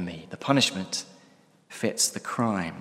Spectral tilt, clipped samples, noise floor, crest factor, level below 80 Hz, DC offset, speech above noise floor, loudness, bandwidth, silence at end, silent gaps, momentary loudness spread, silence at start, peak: -3 dB/octave; under 0.1%; -58 dBFS; 24 dB; -66 dBFS; under 0.1%; 32 dB; -27 LUFS; 16 kHz; 0 s; none; 13 LU; 0 s; -4 dBFS